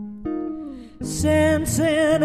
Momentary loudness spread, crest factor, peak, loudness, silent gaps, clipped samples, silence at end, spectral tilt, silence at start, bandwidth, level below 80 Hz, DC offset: 15 LU; 14 dB; -8 dBFS; -21 LUFS; none; under 0.1%; 0 s; -5 dB/octave; 0 s; 14 kHz; -40 dBFS; under 0.1%